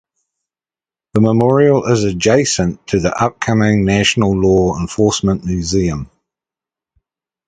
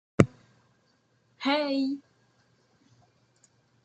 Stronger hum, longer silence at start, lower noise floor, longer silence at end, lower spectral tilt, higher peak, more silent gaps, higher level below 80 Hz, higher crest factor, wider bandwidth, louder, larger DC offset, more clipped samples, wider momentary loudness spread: neither; first, 1.15 s vs 0.2 s; first, under -90 dBFS vs -69 dBFS; second, 1.4 s vs 1.85 s; about the same, -5.5 dB/octave vs -6.5 dB/octave; about the same, 0 dBFS vs -2 dBFS; neither; first, -36 dBFS vs -60 dBFS; second, 16 dB vs 30 dB; about the same, 9.4 kHz vs 9.2 kHz; first, -14 LUFS vs -28 LUFS; neither; neither; about the same, 6 LU vs 7 LU